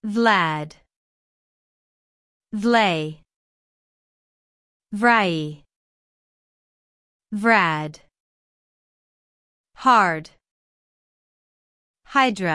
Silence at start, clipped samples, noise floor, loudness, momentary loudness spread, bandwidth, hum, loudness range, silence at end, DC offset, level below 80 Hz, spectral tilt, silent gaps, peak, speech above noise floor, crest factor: 0.05 s; under 0.1%; under -90 dBFS; -20 LUFS; 16 LU; 12 kHz; none; 4 LU; 0 s; under 0.1%; -66 dBFS; -5 dB/octave; 0.96-2.40 s, 3.36-4.80 s, 5.76-7.20 s, 8.20-9.64 s, 10.51-11.94 s; -4 dBFS; over 70 dB; 22 dB